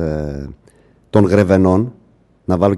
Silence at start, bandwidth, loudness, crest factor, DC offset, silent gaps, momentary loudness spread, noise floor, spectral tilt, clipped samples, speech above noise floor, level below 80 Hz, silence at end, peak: 0 s; 12 kHz; -15 LUFS; 16 dB; under 0.1%; none; 18 LU; -50 dBFS; -8.5 dB/octave; under 0.1%; 36 dB; -38 dBFS; 0 s; 0 dBFS